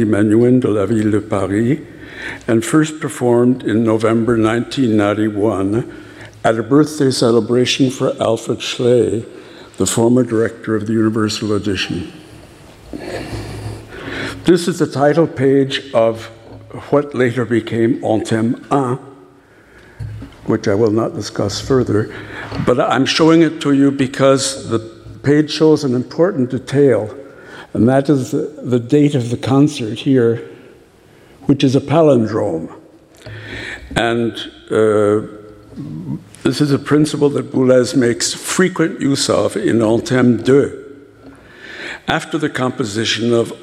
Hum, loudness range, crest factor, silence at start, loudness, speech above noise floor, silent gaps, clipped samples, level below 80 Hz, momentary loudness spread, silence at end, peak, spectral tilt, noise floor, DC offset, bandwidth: none; 5 LU; 16 dB; 0 s; -15 LUFS; 31 dB; none; under 0.1%; -46 dBFS; 15 LU; 0 s; 0 dBFS; -5.5 dB/octave; -46 dBFS; under 0.1%; 14.5 kHz